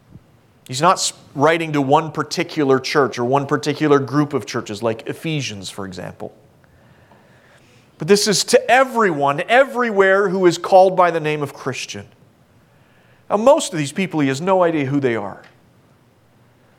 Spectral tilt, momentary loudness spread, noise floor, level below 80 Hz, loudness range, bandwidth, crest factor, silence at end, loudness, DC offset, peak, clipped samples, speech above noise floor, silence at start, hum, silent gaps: -4.5 dB/octave; 14 LU; -54 dBFS; -64 dBFS; 8 LU; 16.5 kHz; 18 dB; 1.4 s; -17 LUFS; under 0.1%; -2 dBFS; under 0.1%; 36 dB; 0.7 s; none; none